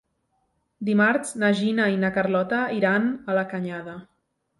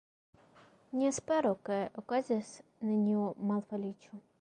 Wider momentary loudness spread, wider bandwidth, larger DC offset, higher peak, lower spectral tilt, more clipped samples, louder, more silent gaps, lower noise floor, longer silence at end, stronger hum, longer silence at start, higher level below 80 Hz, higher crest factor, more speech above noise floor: about the same, 12 LU vs 11 LU; first, 11.5 kHz vs 10 kHz; neither; first, -8 dBFS vs -20 dBFS; about the same, -6 dB/octave vs -6 dB/octave; neither; first, -23 LUFS vs -34 LUFS; neither; first, -72 dBFS vs -62 dBFS; first, 0.55 s vs 0.2 s; neither; about the same, 0.8 s vs 0.9 s; first, -66 dBFS vs -76 dBFS; about the same, 16 dB vs 14 dB; first, 49 dB vs 29 dB